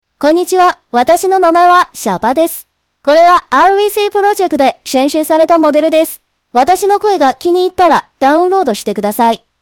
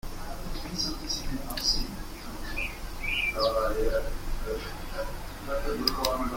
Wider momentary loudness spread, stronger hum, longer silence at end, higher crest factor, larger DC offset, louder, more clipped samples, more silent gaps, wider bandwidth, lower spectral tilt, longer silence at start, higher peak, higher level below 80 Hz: second, 7 LU vs 12 LU; neither; first, 0.25 s vs 0 s; second, 10 dB vs 24 dB; neither; first, -10 LUFS vs -31 LUFS; neither; neither; first, 19.5 kHz vs 16.5 kHz; about the same, -3.5 dB/octave vs -3 dB/octave; first, 0.2 s vs 0.05 s; first, 0 dBFS vs -6 dBFS; second, -48 dBFS vs -36 dBFS